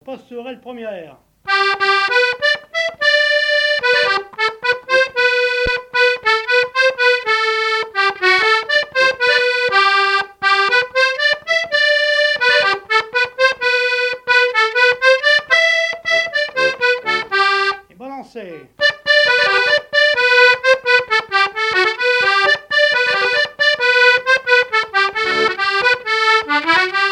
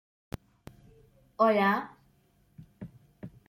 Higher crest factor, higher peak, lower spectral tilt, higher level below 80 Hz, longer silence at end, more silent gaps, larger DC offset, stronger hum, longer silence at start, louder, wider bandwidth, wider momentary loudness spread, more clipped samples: second, 16 dB vs 22 dB; first, 0 dBFS vs -12 dBFS; second, -1 dB/octave vs -7 dB/octave; first, -50 dBFS vs -60 dBFS; second, 0 s vs 0.2 s; neither; neither; neither; second, 0.05 s vs 1.4 s; first, -14 LUFS vs -26 LUFS; second, 12 kHz vs 15.5 kHz; second, 6 LU vs 25 LU; neither